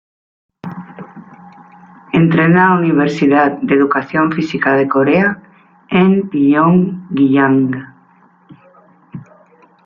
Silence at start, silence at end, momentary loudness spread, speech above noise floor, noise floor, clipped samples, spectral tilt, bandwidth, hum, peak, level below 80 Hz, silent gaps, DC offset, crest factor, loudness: 0.65 s; 0.65 s; 20 LU; 37 dB; -49 dBFS; under 0.1%; -8.5 dB/octave; 7.2 kHz; none; -2 dBFS; -54 dBFS; none; under 0.1%; 14 dB; -13 LUFS